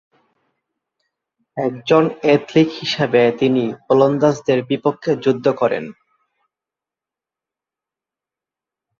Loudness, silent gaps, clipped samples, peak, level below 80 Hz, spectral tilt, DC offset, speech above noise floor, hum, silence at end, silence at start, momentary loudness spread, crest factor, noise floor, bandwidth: -17 LUFS; none; under 0.1%; -2 dBFS; -62 dBFS; -6.5 dB/octave; under 0.1%; 71 dB; none; 3.05 s; 1.55 s; 9 LU; 18 dB; -88 dBFS; 7.4 kHz